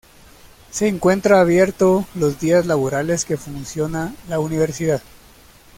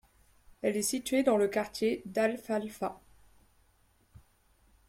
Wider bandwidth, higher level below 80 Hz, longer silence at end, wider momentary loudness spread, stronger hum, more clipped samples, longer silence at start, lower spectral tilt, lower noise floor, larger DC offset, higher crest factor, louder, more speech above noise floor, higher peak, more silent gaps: about the same, 16.5 kHz vs 16.5 kHz; first, -48 dBFS vs -66 dBFS; second, 0.75 s vs 1.9 s; about the same, 11 LU vs 9 LU; neither; neither; about the same, 0.75 s vs 0.65 s; first, -5.5 dB/octave vs -4 dB/octave; second, -47 dBFS vs -68 dBFS; neither; about the same, 16 dB vs 20 dB; first, -18 LUFS vs -31 LUFS; second, 29 dB vs 37 dB; first, -2 dBFS vs -14 dBFS; neither